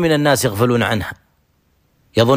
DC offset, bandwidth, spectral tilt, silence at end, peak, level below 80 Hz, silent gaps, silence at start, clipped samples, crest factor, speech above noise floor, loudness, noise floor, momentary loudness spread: under 0.1%; 15.5 kHz; -5 dB/octave; 0 s; -2 dBFS; -46 dBFS; none; 0 s; under 0.1%; 14 dB; 45 dB; -17 LUFS; -61 dBFS; 8 LU